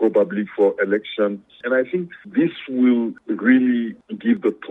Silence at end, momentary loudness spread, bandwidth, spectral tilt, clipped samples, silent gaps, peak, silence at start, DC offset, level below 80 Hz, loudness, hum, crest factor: 0.05 s; 9 LU; 3.9 kHz; -8.5 dB/octave; under 0.1%; none; -4 dBFS; 0 s; under 0.1%; -70 dBFS; -20 LUFS; none; 16 dB